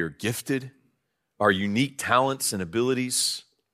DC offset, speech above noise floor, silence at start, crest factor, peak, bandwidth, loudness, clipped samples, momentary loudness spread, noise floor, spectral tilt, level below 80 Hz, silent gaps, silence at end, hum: under 0.1%; 50 dB; 0 s; 22 dB; -4 dBFS; 15.5 kHz; -25 LUFS; under 0.1%; 8 LU; -75 dBFS; -3.5 dB/octave; -66 dBFS; none; 0.35 s; none